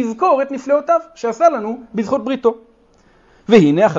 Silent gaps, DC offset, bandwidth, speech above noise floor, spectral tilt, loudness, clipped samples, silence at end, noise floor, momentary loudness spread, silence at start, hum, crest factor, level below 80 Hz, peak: none; under 0.1%; 7.8 kHz; 37 dB; -6.5 dB/octave; -16 LUFS; under 0.1%; 0 s; -52 dBFS; 12 LU; 0 s; none; 16 dB; -56 dBFS; 0 dBFS